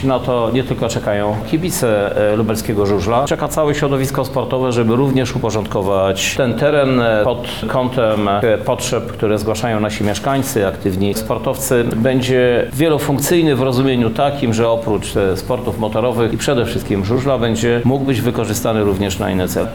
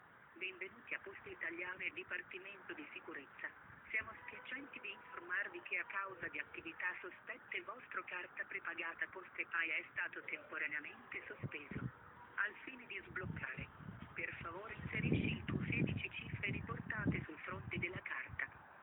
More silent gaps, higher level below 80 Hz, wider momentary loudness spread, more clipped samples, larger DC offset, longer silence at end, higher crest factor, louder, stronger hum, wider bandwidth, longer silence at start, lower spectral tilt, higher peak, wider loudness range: neither; first, -38 dBFS vs -66 dBFS; second, 5 LU vs 11 LU; neither; first, 1% vs under 0.1%; about the same, 0 s vs 0 s; second, 12 dB vs 24 dB; first, -16 LUFS vs -44 LUFS; neither; about the same, 19 kHz vs over 20 kHz; about the same, 0 s vs 0 s; second, -5.5 dB/octave vs -8.5 dB/octave; first, -4 dBFS vs -22 dBFS; second, 2 LU vs 5 LU